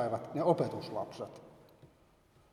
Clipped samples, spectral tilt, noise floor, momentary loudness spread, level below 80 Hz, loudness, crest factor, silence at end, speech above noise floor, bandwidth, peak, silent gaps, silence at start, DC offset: under 0.1%; -7.5 dB/octave; -66 dBFS; 16 LU; -74 dBFS; -35 LUFS; 24 dB; 0.65 s; 31 dB; 14.5 kHz; -14 dBFS; none; 0 s; under 0.1%